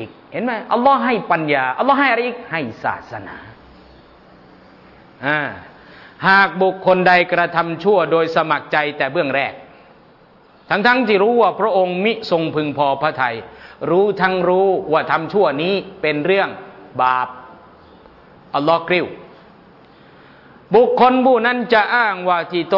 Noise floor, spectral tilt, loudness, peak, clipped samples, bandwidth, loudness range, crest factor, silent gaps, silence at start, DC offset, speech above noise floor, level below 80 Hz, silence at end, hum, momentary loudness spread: -49 dBFS; -7.5 dB/octave; -16 LUFS; -2 dBFS; under 0.1%; 6 kHz; 7 LU; 16 dB; none; 0 s; under 0.1%; 32 dB; -58 dBFS; 0 s; none; 12 LU